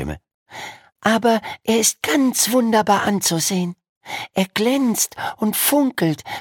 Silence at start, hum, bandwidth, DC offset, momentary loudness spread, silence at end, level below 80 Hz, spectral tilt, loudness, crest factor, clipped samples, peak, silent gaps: 0 s; none; 17.5 kHz; under 0.1%; 14 LU; 0 s; -50 dBFS; -3.5 dB/octave; -18 LUFS; 18 dB; under 0.1%; -2 dBFS; 0.34-0.46 s, 3.89-4.01 s